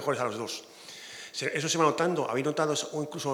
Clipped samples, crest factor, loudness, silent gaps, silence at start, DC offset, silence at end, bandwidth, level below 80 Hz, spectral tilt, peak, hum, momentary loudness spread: under 0.1%; 20 dB; -29 LUFS; none; 0 s; under 0.1%; 0 s; 19 kHz; -82 dBFS; -3.5 dB/octave; -10 dBFS; none; 16 LU